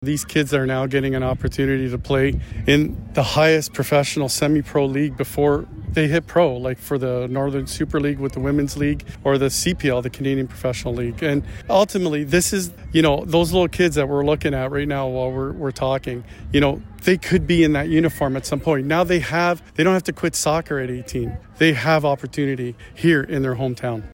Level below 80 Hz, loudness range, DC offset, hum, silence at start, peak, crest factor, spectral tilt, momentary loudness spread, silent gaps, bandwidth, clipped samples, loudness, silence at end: -38 dBFS; 3 LU; under 0.1%; none; 0 s; -4 dBFS; 16 dB; -5.5 dB/octave; 7 LU; none; 16.5 kHz; under 0.1%; -20 LUFS; 0 s